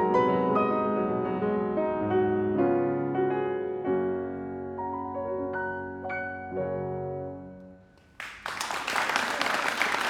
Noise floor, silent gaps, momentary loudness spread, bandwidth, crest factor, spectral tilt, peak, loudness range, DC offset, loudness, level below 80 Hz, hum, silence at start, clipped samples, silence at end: -54 dBFS; none; 11 LU; 16.5 kHz; 24 dB; -5 dB/octave; -6 dBFS; 8 LU; under 0.1%; -29 LUFS; -62 dBFS; none; 0 s; under 0.1%; 0 s